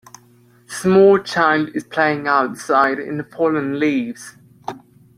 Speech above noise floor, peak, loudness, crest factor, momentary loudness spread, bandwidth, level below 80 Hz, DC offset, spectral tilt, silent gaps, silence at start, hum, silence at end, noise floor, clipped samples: 35 dB; -2 dBFS; -17 LUFS; 16 dB; 20 LU; 14 kHz; -62 dBFS; under 0.1%; -5.5 dB/octave; none; 0.7 s; none; 0.4 s; -51 dBFS; under 0.1%